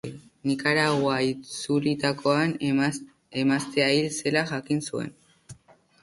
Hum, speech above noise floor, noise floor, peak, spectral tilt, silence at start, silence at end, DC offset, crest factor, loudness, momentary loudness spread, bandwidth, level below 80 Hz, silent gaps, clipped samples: none; 29 dB; -54 dBFS; -6 dBFS; -5 dB/octave; 0.05 s; 0.5 s; under 0.1%; 20 dB; -25 LUFS; 11 LU; 11.5 kHz; -64 dBFS; none; under 0.1%